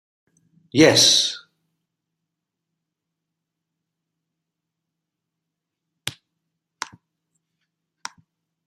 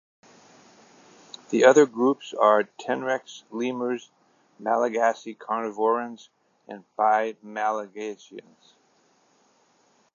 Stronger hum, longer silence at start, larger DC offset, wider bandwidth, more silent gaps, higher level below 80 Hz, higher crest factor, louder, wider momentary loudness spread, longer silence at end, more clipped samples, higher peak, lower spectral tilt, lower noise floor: neither; second, 0.75 s vs 1.5 s; neither; first, 15 kHz vs 7.4 kHz; neither; first, -64 dBFS vs -86 dBFS; about the same, 26 dB vs 24 dB; first, -15 LUFS vs -24 LUFS; first, 26 LU vs 23 LU; first, 2.55 s vs 1.75 s; neither; about the same, -2 dBFS vs -2 dBFS; second, -2.5 dB/octave vs -4.5 dB/octave; first, -83 dBFS vs -64 dBFS